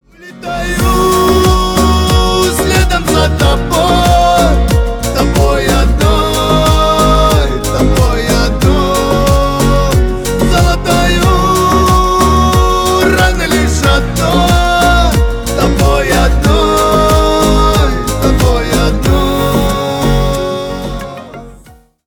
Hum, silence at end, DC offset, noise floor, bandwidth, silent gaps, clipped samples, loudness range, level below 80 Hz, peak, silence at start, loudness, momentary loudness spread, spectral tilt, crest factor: none; 0.5 s; under 0.1%; -40 dBFS; over 20 kHz; none; under 0.1%; 2 LU; -14 dBFS; 0 dBFS; 0.2 s; -10 LUFS; 5 LU; -5 dB/octave; 10 dB